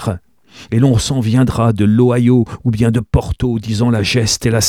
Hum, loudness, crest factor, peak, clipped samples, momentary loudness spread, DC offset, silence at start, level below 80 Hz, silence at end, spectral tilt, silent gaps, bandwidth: none; -14 LUFS; 12 dB; 0 dBFS; under 0.1%; 7 LU; 0.2%; 0 s; -30 dBFS; 0 s; -5.5 dB/octave; none; 14.5 kHz